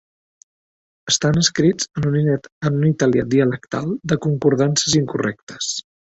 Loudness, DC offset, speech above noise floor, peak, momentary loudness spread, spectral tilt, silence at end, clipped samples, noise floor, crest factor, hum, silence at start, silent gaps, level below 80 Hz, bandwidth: -19 LUFS; under 0.1%; over 72 dB; -2 dBFS; 8 LU; -4.5 dB/octave; 0.25 s; under 0.1%; under -90 dBFS; 16 dB; none; 1.05 s; 2.52-2.61 s, 5.43-5.47 s; -50 dBFS; 8.2 kHz